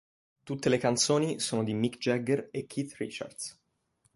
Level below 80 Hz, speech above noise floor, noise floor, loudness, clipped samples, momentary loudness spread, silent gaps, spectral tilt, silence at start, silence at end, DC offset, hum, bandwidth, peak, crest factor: -68 dBFS; 43 dB; -73 dBFS; -30 LUFS; under 0.1%; 13 LU; none; -4.5 dB/octave; 0.45 s; 0.65 s; under 0.1%; none; 11.5 kHz; -12 dBFS; 20 dB